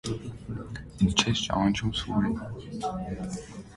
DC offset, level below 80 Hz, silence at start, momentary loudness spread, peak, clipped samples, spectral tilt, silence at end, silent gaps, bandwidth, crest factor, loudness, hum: under 0.1%; -44 dBFS; 0.05 s; 14 LU; -4 dBFS; under 0.1%; -4.5 dB/octave; 0 s; none; 11.5 kHz; 24 dB; -29 LUFS; none